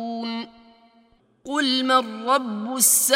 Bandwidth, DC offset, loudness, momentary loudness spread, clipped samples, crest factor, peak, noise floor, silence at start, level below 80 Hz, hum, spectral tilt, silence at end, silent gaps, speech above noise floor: 16.5 kHz; under 0.1%; -21 LUFS; 14 LU; under 0.1%; 20 dB; -4 dBFS; -59 dBFS; 0 s; -72 dBFS; none; -1 dB/octave; 0 s; none; 39 dB